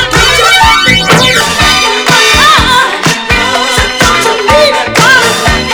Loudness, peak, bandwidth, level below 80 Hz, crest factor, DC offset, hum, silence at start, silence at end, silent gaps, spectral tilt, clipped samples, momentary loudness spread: -5 LUFS; 0 dBFS; over 20 kHz; -22 dBFS; 6 dB; under 0.1%; none; 0 s; 0 s; none; -2.5 dB/octave; 3%; 5 LU